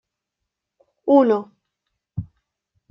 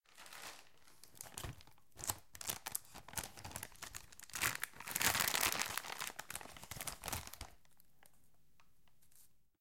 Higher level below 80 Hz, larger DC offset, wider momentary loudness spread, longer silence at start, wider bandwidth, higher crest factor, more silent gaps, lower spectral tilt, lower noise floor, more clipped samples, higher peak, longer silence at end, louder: first, -56 dBFS vs -64 dBFS; neither; about the same, 19 LU vs 19 LU; first, 1.05 s vs 0 s; second, 5.8 kHz vs 17 kHz; second, 20 dB vs 30 dB; neither; first, -9.5 dB/octave vs -1 dB/octave; first, -82 dBFS vs -74 dBFS; neither; first, -4 dBFS vs -14 dBFS; first, 0.65 s vs 0 s; first, -18 LUFS vs -41 LUFS